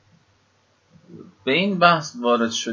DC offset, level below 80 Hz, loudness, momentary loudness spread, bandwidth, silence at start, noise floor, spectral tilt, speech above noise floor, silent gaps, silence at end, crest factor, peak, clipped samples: under 0.1%; -66 dBFS; -19 LUFS; 6 LU; 7.6 kHz; 1.1 s; -62 dBFS; -4 dB/octave; 43 dB; none; 0 s; 22 dB; 0 dBFS; under 0.1%